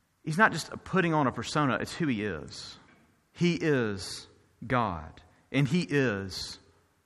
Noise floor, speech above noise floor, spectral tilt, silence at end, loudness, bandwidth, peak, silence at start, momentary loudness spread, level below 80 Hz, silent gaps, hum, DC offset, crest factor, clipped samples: -62 dBFS; 33 dB; -5.5 dB/octave; 0.5 s; -29 LUFS; 12.5 kHz; -8 dBFS; 0.25 s; 17 LU; -58 dBFS; none; none; under 0.1%; 22 dB; under 0.1%